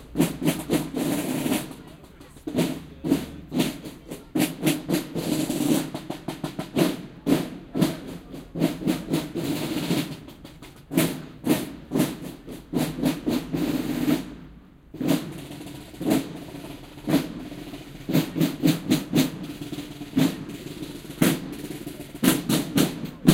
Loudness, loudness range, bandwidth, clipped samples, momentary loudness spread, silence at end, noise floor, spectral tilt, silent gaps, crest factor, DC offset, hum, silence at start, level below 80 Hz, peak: -26 LUFS; 3 LU; 17 kHz; under 0.1%; 15 LU; 0 s; -47 dBFS; -5 dB/octave; none; 26 dB; under 0.1%; none; 0 s; -50 dBFS; 0 dBFS